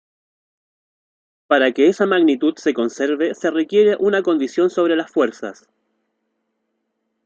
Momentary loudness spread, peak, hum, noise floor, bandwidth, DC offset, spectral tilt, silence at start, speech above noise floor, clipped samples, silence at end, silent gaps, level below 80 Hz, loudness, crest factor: 6 LU; -2 dBFS; none; -73 dBFS; 7.8 kHz; under 0.1%; -5 dB/octave; 1.5 s; 56 dB; under 0.1%; 1.75 s; none; -70 dBFS; -17 LUFS; 18 dB